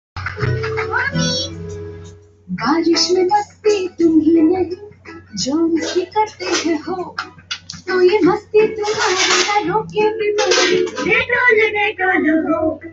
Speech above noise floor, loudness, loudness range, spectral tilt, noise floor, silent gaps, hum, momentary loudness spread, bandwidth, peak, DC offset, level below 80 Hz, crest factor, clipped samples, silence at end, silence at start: 23 dB; -16 LUFS; 4 LU; -4 dB/octave; -39 dBFS; none; none; 15 LU; 8 kHz; -2 dBFS; under 0.1%; -50 dBFS; 16 dB; under 0.1%; 0 s; 0.15 s